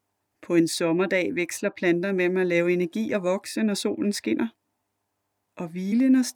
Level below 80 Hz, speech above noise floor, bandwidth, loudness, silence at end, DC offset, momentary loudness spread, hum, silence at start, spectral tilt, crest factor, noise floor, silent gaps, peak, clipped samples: -76 dBFS; 54 dB; 18 kHz; -25 LUFS; 0.05 s; under 0.1%; 6 LU; none; 0.4 s; -5 dB/octave; 16 dB; -78 dBFS; none; -10 dBFS; under 0.1%